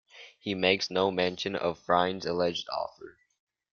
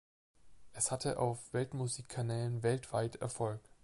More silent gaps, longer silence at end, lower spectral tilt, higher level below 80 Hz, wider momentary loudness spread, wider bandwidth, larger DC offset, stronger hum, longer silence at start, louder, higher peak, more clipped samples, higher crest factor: neither; first, 0.65 s vs 0.25 s; about the same, -4.5 dB/octave vs -5 dB/octave; about the same, -68 dBFS vs -64 dBFS; first, 9 LU vs 5 LU; second, 7.2 kHz vs 11.5 kHz; neither; neither; second, 0.15 s vs 0.45 s; first, -29 LUFS vs -37 LUFS; first, -8 dBFS vs -20 dBFS; neither; about the same, 22 dB vs 18 dB